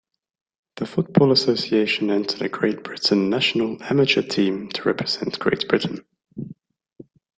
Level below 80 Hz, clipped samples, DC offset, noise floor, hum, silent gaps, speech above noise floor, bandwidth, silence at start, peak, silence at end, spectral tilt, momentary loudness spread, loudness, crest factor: -62 dBFS; under 0.1%; under 0.1%; -43 dBFS; none; none; 23 dB; 9.2 kHz; 0.75 s; -2 dBFS; 0.85 s; -5.5 dB/octave; 15 LU; -21 LUFS; 20 dB